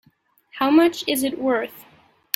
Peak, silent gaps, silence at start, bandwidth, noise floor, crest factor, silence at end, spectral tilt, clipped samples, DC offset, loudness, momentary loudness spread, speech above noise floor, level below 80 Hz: 0 dBFS; none; 0.55 s; 16.5 kHz; -61 dBFS; 22 dB; 0.55 s; -3 dB/octave; under 0.1%; under 0.1%; -20 LUFS; 14 LU; 41 dB; -64 dBFS